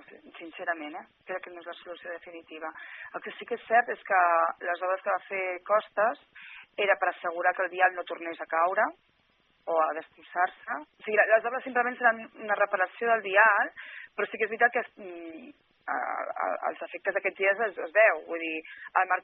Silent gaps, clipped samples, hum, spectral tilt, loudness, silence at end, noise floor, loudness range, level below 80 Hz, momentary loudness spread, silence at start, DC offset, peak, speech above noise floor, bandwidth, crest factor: none; under 0.1%; none; 0 dB/octave; -28 LUFS; 0.05 s; -69 dBFS; 6 LU; -82 dBFS; 19 LU; 0.25 s; under 0.1%; -6 dBFS; 40 dB; 4.1 kHz; 22 dB